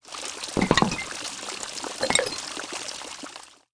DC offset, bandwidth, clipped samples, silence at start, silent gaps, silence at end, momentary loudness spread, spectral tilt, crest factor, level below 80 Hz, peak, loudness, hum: under 0.1%; 10.5 kHz; under 0.1%; 0.05 s; none; 0.2 s; 14 LU; -3 dB/octave; 26 dB; -52 dBFS; -4 dBFS; -27 LUFS; none